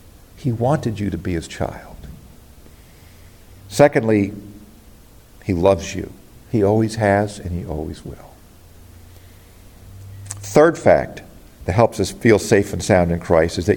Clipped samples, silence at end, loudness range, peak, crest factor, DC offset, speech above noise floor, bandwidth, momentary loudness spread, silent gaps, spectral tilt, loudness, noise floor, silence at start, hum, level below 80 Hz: under 0.1%; 0 s; 8 LU; 0 dBFS; 20 dB; under 0.1%; 28 dB; 17 kHz; 22 LU; none; -6 dB/octave; -18 LUFS; -45 dBFS; 0.35 s; none; -44 dBFS